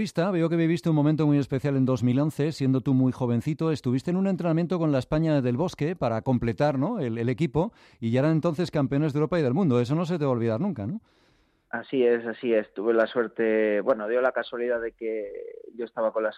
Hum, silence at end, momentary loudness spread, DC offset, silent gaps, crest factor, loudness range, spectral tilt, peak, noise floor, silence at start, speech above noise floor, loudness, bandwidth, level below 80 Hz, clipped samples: none; 0 s; 7 LU; under 0.1%; none; 14 dB; 2 LU; -8 dB/octave; -10 dBFS; -65 dBFS; 0 s; 40 dB; -25 LUFS; 12.5 kHz; -56 dBFS; under 0.1%